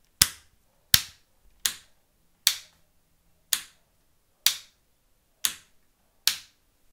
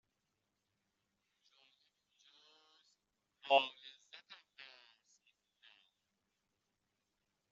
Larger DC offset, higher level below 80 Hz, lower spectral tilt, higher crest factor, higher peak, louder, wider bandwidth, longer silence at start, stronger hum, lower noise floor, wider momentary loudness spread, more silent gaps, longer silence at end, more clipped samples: neither; first, -56 dBFS vs under -90 dBFS; first, 1 dB/octave vs 2.5 dB/octave; about the same, 32 dB vs 30 dB; first, 0 dBFS vs -16 dBFS; first, -26 LUFS vs -34 LUFS; first, 16 kHz vs 7.4 kHz; second, 0.2 s vs 3.45 s; neither; second, -67 dBFS vs -86 dBFS; second, 15 LU vs 25 LU; neither; second, 0.5 s vs 2.9 s; neither